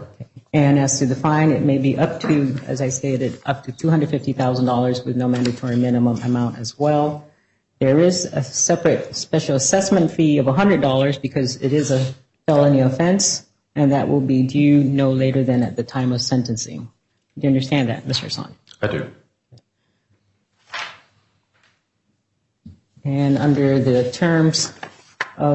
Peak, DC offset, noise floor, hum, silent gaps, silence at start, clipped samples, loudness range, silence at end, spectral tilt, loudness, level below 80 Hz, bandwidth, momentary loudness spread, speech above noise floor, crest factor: -4 dBFS; under 0.1%; -70 dBFS; none; none; 0 s; under 0.1%; 11 LU; 0 s; -5.5 dB/octave; -18 LUFS; -56 dBFS; 8.4 kHz; 11 LU; 52 dB; 14 dB